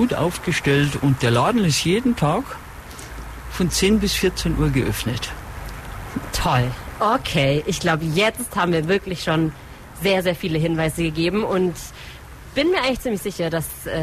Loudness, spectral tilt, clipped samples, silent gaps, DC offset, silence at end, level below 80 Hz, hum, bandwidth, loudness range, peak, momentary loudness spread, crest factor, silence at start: -21 LUFS; -5 dB/octave; under 0.1%; none; under 0.1%; 0 s; -36 dBFS; none; 15.5 kHz; 2 LU; -8 dBFS; 16 LU; 14 dB; 0 s